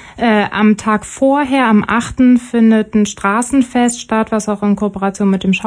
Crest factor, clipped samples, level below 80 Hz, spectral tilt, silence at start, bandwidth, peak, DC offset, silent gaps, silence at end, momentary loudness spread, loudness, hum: 12 dB; under 0.1%; -42 dBFS; -5.5 dB/octave; 0.05 s; 10.5 kHz; -2 dBFS; under 0.1%; none; 0 s; 5 LU; -13 LUFS; none